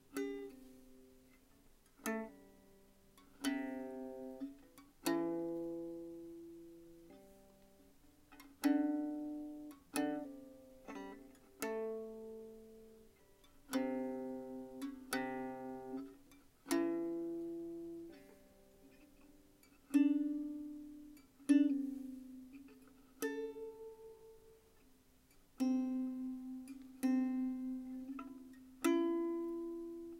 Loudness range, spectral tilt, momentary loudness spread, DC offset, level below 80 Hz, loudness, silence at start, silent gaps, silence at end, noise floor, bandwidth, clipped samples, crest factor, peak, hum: 9 LU; -4.5 dB/octave; 22 LU; under 0.1%; -72 dBFS; -41 LUFS; 0.1 s; none; 0 s; -68 dBFS; 16 kHz; under 0.1%; 22 dB; -20 dBFS; none